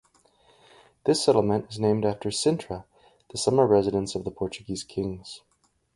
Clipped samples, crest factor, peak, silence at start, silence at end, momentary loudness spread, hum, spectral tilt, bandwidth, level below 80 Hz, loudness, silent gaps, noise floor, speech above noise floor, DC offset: under 0.1%; 20 dB; -6 dBFS; 1.05 s; 0.6 s; 16 LU; none; -5.5 dB/octave; 11.5 kHz; -54 dBFS; -25 LUFS; none; -62 dBFS; 37 dB; under 0.1%